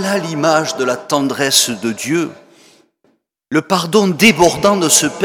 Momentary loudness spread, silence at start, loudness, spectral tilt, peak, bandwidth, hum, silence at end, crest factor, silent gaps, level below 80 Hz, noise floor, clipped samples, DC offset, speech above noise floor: 9 LU; 0 s; -14 LUFS; -3 dB/octave; 0 dBFS; 19.5 kHz; none; 0 s; 16 dB; none; -50 dBFS; -60 dBFS; under 0.1%; under 0.1%; 46 dB